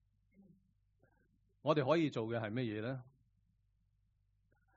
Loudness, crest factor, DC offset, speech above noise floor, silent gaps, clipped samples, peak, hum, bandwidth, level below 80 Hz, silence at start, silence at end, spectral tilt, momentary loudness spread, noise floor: -37 LUFS; 24 dB; under 0.1%; 41 dB; none; under 0.1%; -16 dBFS; none; 6.6 kHz; -76 dBFS; 1.65 s; 1.75 s; -5.5 dB/octave; 11 LU; -77 dBFS